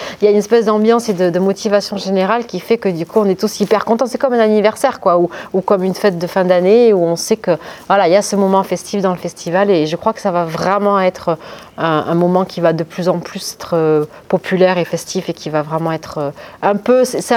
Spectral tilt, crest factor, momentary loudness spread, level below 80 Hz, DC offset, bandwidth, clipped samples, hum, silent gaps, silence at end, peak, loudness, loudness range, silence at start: -5.5 dB/octave; 14 dB; 8 LU; -56 dBFS; under 0.1%; 17 kHz; under 0.1%; none; none; 0 s; 0 dBFS; -15 LUFS; 3 LU; 0 s